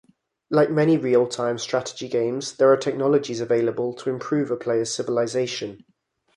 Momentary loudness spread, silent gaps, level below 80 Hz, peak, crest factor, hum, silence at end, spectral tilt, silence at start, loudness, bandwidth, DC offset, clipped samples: 8 LU; none; -68 dBFS; -6 dBFS; 18 dB; none; 0.6 s; -5 dB/octave; 0.5 s; -23 LUFS; 11.5 kHz; under 0.1%; under 0.1%